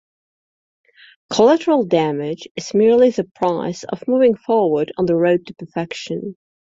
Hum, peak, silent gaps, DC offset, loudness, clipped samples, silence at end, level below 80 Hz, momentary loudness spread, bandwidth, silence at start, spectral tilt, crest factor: none; -2 dBFS; 2.51-2.55 s, 3.31-3.35 s; under 0.1%; -18 LUFS; under 0.1%; 0.35 s; -60 dBFS; 13 LU; 7.8 kHz; 1.3 s; -6 dB/octave; 16 dB